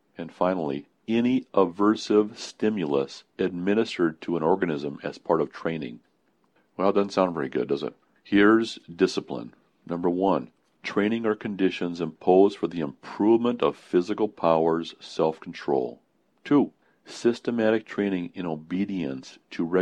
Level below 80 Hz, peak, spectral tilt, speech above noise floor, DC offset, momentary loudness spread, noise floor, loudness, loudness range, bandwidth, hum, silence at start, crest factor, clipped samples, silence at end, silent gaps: -64 dBFS; -6 dBFS; -6.5 dB/octave; 43 dB; under 0.1%; 13 LU; -68 dBFS; -26 LUFS; 4 LU; 9.6 kHz; none; 0.2 s; 20 dB; under 0.1%; 0 s; none